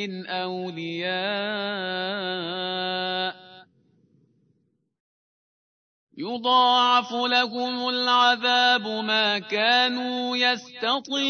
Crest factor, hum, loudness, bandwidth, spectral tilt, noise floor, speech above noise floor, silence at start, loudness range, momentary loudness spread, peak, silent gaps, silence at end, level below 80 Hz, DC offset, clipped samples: 18 dB; none; -23 LUFS; 6.6 kHz; -3.5 dB/octave; -70 dBFS; 46 dB; 0 s; 12 LU; 11 LU; -8 dBFS; 5.00-6.07 s; 0 s; -86 dBFS; under 0.1%; under 0.1%